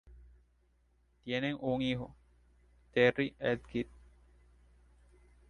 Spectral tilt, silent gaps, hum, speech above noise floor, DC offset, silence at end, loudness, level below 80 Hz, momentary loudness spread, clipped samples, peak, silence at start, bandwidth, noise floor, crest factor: -7 dB/octave; none; 60 Hz at -55 dBFS; 38 dB; under 0.1%; 1.65 s; -34 LUFS; -60 dBFS; 14 LU; under 0.1%; -12 dBFS; 0.05 s; 8.6 kHz; -71 dBFS; 24 dB